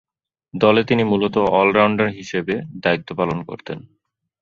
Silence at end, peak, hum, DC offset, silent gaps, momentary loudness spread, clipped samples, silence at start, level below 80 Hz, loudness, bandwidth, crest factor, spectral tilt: 0.6 s; -2 dBFS; none; under 0.1%; none; 16 LU; under 0.1%; 0.55 s; -54 dBFS; -18 LUFS; 7.4 kHz; 18 dB; -6.5 dB/octave